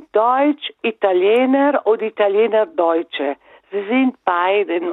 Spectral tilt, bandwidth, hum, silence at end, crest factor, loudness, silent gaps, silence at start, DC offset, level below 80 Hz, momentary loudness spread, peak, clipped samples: -6.5 dB/octave; 4.1 kHz; none; 0 s; 16 dB; -17 LUFS; none; 0.15 s; under 0.1%; -76 dBFS; 9 LU; -2 dBFS; under 0.1%